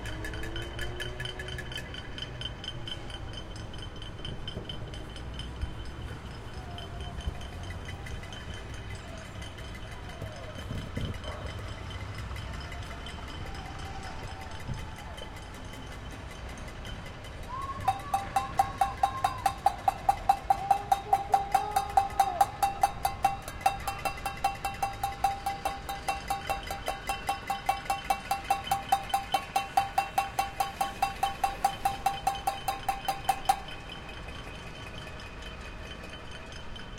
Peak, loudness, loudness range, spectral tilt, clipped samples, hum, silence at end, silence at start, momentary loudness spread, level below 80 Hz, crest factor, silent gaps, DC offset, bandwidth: -10 dBFS; -33 LUFS; 12 LU; -3.5 dB/octave; under 0.1%; none; 0 s; 0 s; 14 LU; -44 dBFS; 22 dB; none; under 0.1%; 16.5 kHz